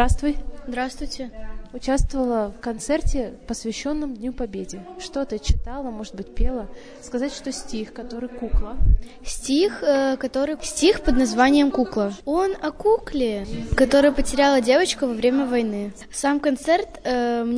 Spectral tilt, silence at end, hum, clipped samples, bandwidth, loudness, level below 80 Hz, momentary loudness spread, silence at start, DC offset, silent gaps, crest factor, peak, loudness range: -5 dB/octave; 0 s; none; under 0.1%; 11 kHz; -23 LUFS; -30 dBFS; 14 LU; 0 s; under 0.1%; none; 18 dB; -4 dBFS; 9 LU